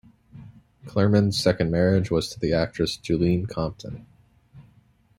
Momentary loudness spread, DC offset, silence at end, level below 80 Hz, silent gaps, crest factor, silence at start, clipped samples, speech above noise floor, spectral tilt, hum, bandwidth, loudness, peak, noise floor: 11 LU; under 0.1%; 0.55 s; -48 dBFS; none; 20 dB; 0.35 s; under 0.1%; 36 dB; -6.5 dB/octave; none; 14 kHz; -23 LUFS; -6 dBFS; -59 dBFS